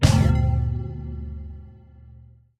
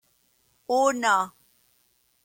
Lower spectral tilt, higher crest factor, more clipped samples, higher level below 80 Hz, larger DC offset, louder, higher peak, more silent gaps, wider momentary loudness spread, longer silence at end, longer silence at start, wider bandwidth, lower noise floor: first, -6.5 dB/octave vs -2 dB/octave; about the same, 20 dB vs 18 dB; neither; first, -30 dBFS vs -74 dBFS; neither; about the same, -23 LUFS vs -24 LUFS; first, -2 dBFS vs -8 dBFS; neither; first, 20 LU vs 14 LU; second, 0.45 s vs 0.95 s; second, 0 s vs 0.7 s; second, 13.5 kHz vs 17 kHz; second, -49 dBFS vs -67 dBFS